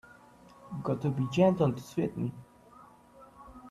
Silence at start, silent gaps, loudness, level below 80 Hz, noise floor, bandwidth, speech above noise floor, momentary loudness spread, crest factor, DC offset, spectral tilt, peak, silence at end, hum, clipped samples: 0.65 s; none; -30 LUFS; -62 dBFS; -56 dBFS; 13.5 kHz; 27 dB; 25 LU; 20 dB; under 0.1%; -8 dB/octave; -12 dBFS; 0 s; none; under 0.1%